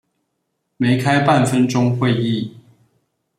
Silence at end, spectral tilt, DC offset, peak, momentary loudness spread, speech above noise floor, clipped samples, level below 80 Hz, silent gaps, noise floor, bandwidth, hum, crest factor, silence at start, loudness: 0.8 s; -6.5 dB/octave; under 0.1%; -2 dBFS; 8 LU; 57 dB; under 0.1%; -58 dBFS; none; -73 dBFS; 13.5 kHz; none; 16 dB; 0.8 s; -17 LUFS